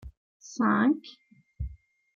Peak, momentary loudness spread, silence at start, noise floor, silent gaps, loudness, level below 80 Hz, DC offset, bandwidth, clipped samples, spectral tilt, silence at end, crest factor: -12 dBFS; 19 LU; 0.05 s; -46 dBFS; 0.17-0.40 s; -26 LUFS; -46 dBFS; under 0.1%; 7.4 kHz; under 0.1%; -6 dB/octave; 0.4 s; 18 dB